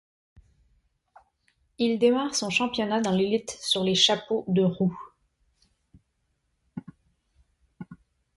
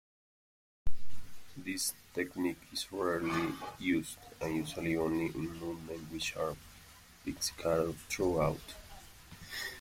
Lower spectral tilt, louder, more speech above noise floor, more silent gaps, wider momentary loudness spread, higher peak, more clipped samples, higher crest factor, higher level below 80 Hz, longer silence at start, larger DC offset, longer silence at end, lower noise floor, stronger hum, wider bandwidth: about the same, -4 dB/octave vs -4 dB/octave; first, -24 LUFS vs -36 LUFS; first, 50 dB vs 21 dB; neither; first, 23 LU vs 20 LU; first, -6 dBFS vs -18 dBFS; neither; about the same, 22 dB vs 18 dB; second, -64 dBFS vs -54 dBFS; first, 1.8 s vs 0.85 s; neither; first, 0.4 s vs 0 s; first, -75 dBFS vs -57 dBFS; neither; second, 11.5 kHz vs 16.5 kHz